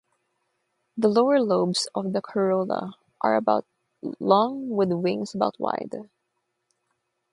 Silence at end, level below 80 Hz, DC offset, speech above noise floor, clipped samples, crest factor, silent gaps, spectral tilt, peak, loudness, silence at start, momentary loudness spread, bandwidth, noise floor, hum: 1.3 s; -72 dBFS; under 0.1%; 54 dB; under 0.1%; 22 dB; none; -5.5 dB/octave; -4 dBFS; -24 LUFS; 0.95 s; 15 LU; 11.5 kHz; -77 dBFS; none